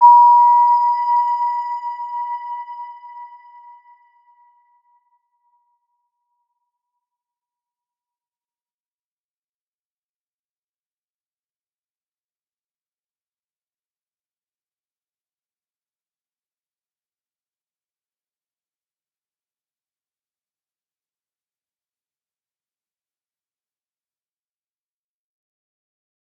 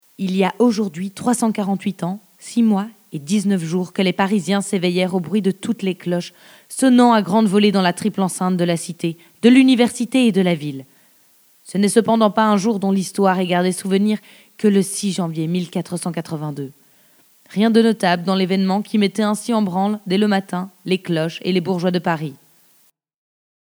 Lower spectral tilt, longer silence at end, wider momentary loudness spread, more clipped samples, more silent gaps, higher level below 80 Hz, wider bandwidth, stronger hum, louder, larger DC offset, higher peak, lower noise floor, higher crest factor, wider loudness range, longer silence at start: second, 1.5 dB/octave vs -5.5 dB/octave; first, 22.95 s vs 1.4 s; first, 25 LU vs 12 LU; neither; neither; second, under -90 dBFS vs -74 dBFS; second, 5.2 kHz vs over 20 kHz; neither; first, -15 LUFS vs -18 LUFS; neither; about the same, -2 dBFS vs 0 dBFS; first, under -90 dBFS vs -58 dBFS; about the same, 22 dB vs 18 dB; first, 24 LU vs 5 LU; second, 0 s vs 0.2 s